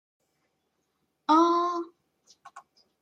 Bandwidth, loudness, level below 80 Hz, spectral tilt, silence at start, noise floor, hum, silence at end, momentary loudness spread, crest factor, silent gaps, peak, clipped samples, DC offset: 8 kHz; -25 LUFS; -88 dBFS; -3 dB/octave; 1.3 s; -77 dBFS; none; 0.45 s; 16 LU; 20 dB; none; -10 dBFS; under 0.1%; under 0.1%